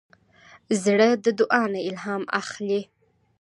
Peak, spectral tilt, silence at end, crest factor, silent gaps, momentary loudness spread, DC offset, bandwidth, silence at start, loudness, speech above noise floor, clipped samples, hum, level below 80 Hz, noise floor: -4 dBFS; -4.5 dB/octave; 0.55 s; 20 dB; none; 10 LU; under 0.1%; 11.5 kHz; 0.7 s; -23 LUFS; 31 dB; under 0.1%; none; -72 dBFS; -53 dBFS